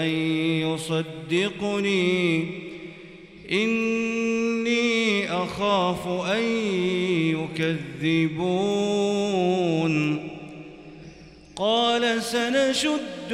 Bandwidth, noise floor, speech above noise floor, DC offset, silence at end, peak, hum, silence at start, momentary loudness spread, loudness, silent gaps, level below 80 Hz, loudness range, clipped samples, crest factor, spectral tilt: 14.5 kHz; -46 dBFS; 22 dB; under 0.1%; 0 s; -10 dBFS; none; 0 s; 17 LU; -24 LUFS; none; -60 dBFS; 2 LU; under 0.1%; 14 dB; -5 dB/octave